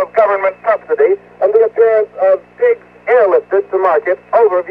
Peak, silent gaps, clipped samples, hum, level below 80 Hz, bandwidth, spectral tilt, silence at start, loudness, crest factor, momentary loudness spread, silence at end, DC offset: 0 dBFS; none; under 0.1%; 60 Hz at -50 dBFS; -60 dBFS; 4.8 kHz; -7 dB/octave; 0 s; -13 LUFS; 12 dB; 5 LU; 0 s; under 0.1%